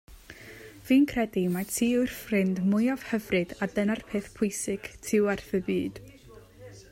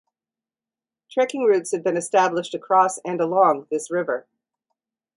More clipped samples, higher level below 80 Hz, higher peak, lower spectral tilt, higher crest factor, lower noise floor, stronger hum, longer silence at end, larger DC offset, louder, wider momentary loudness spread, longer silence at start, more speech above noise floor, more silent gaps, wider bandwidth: neither; first, -56 dBFS vs -76 dBFS; second, -12 dBFS vs -4 dBFS; about the same, -5.5 dB/octave vs -4.5 dB/octave; about the same, 16 dB vs 18 dB; second, -51 dBFS vs under -90 dBFS; neither; second, 0.1 s vs 0.95 s; neither; second, -28 LUFS vs -21 LUFS; first, 20 LU vs 9 LU; second, 0.1 s vs 1.1 s; second, 24 dB vs over 69 dB; neither; first, 16 kHz vs 11.5 kHz